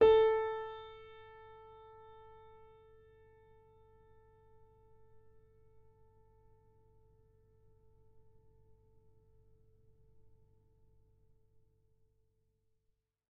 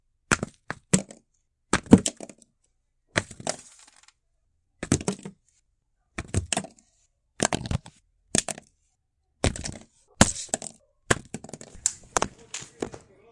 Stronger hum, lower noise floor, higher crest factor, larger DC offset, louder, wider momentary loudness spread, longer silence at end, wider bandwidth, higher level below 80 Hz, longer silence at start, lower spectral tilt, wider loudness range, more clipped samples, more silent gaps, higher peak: neither; first, -82 dBFS vs -73 dBFS; about the same, 26 dB vs 30 dB; neither; second, -32 LUFS vs -27 LUFS; first, 30 LU vs 19 LU; first, 12.4 s vs 0.35 s; second, 4.8 kHz vs 11.5 kHz; second, -66 dBFS vs -46 dBFS; second, 0 s vs 0.3 s; second, -2.5 dB/octave vs -4 dB/octave; first, 27 LU vs 7 LU; neither; neither; second, -16 dBFS vs 0 dBFS